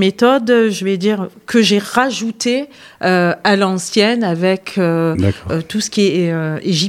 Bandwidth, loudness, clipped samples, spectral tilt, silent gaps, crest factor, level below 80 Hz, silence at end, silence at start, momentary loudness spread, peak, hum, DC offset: 15.5 kHz; -15 LUFS; under 0.1%; -5 dB/octave; none; 14 dB; -50 dBFS; 0 s; 0 s; 6 LU; 0 dBFS; none; under 0.1%